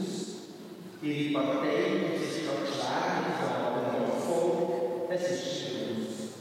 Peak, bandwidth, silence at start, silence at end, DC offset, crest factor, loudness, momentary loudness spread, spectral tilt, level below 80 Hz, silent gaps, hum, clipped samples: -14 dBFS; 16 kHz; 0 s; 0 s; under 0.1%; 16 dB; -31 LUFS; 9 LU; -5 dB/octave; -88 dBFS; none; none; under 0.1%